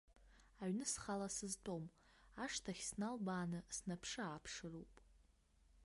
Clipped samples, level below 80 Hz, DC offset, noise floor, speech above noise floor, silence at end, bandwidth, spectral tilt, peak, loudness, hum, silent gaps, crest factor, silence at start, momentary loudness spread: under 0.1%; -70 dBFS; under 0.1%; -74 dBFS; 27 dB; 0 s; 11.5 kHz; -4 dB/octave; -30 dBFS; -46 LUFS; none; none; 18 dB; 0.1 s; 10 LU